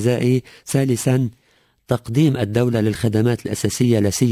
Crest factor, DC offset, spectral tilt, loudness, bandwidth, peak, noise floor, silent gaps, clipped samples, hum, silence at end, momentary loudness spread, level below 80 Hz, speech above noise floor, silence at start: 16 dB; under 0.1%; -6 dB/octave; -19 LUFS; 16 kHz; -4 dBFS; -60 dBFS; none; under 0.1%; none; 0 s; 6 LU; -46 dBFS; 42 dB; 0 s